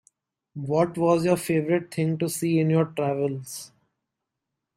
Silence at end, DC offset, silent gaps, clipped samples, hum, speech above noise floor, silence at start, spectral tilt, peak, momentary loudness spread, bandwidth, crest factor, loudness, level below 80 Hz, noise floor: 1.1 s; under 0.1%; none; under 0.1%; none; 60 dB; 0.55 s; -6.5 dB/octave; -8 dBFS; 14 LU; 16 kHz; 18 dB; -24 LUFS; -66 dBFS; -84 dBFS